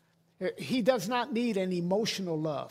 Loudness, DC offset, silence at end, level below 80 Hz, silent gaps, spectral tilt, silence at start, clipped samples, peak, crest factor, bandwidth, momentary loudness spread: -31 LUFS; under 0.1%; 0 s; -74 dBFS; none; -5 dB/octave; 0.4 s; under 0.1%; -12 dBFS; 18 dB; 16 kHz; 8 LU